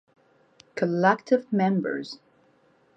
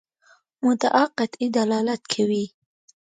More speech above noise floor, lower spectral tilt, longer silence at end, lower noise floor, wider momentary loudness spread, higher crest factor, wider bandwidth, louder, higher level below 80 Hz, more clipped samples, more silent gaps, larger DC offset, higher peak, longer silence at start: about the same, 38 dB vs 38 dB; first, -7.5 dB/octave vs -4.5 dB/octave; about the same, 0.8 s vs 0.7 s; about the same, -62 dBFS vs -60 dBFS; first, 18 LU vs 6 LU; about the same, 22 dB vs 20 dB; second, 7.8 kHz vs 9.4 kHz; about the same, -25 LUFS vs -23 LUFS; second, -78 dBFS vs -72 dBFS; neither; neither; neither; about the same, -6 dBFS vs -4 dBFS; first, 0.75 s vs 0.6 s